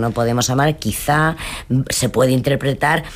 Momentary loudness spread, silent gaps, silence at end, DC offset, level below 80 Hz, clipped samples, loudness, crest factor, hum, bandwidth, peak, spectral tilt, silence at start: 5 LU; none; 0 s; under 0.1%; -38 dBFS; under 0.1%; -17 LUFS; 14 dB; none; 15.5 kHz; -4 dBFS; -5 dB/octave; 0 s